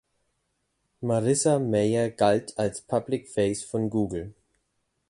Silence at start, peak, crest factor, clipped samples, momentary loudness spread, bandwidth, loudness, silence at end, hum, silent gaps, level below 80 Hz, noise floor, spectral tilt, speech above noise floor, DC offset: 1 s; -8 dBFS; 20 dB; under 0.1%; 8 LU; 11.5 kHz; -26 LUFS; 0.8 s; none; none; -56 dBFS; -76 dBFS; -5.5 dB/octave; 51 dB; under 0.1%